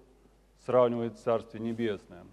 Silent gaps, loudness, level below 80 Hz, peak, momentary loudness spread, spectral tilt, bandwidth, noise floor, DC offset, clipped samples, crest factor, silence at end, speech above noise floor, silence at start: none; -30 LUFS; -64 dBFS; -12 dBFS; 13 LU; -7.5 dB/octave; 10.5 kHz; -62 dBFS; under 0.1%; under 0.1%; 20 dB; 0.05 s; 32 dB; 0.7 s